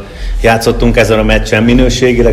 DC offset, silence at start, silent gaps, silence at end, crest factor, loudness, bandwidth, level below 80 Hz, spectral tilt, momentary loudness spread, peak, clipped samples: under 0.1%; 0 s; none; 0 s; 8 dB; -9 LUFS; 14 kHz; -16 dBFS; -5.5 dB/octave; 3 LU; 0 dBFS; 1%